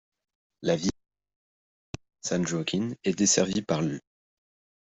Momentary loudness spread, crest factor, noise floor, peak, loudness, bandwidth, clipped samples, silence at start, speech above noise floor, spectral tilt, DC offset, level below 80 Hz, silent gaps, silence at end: 18 LU; 22 dB; under -90 dBFS; -8 dBFS; -27 LUFS; 8.2 kHz; under 0.1%; 0.6 s; over 63 dB; -4 dB/octave; under 0.1%; -60 dBFS; 1.36-1.94 s; 0.9 s